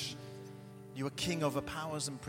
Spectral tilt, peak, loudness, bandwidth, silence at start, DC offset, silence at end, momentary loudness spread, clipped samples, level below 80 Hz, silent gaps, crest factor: -4 dB/octave; -20 dBFS; -37 LUFS; 16.5 kHz; 0 s; under 0.1%; 0 s; 16 LU; under 0.1%; -64 dBFS; none; 20 dB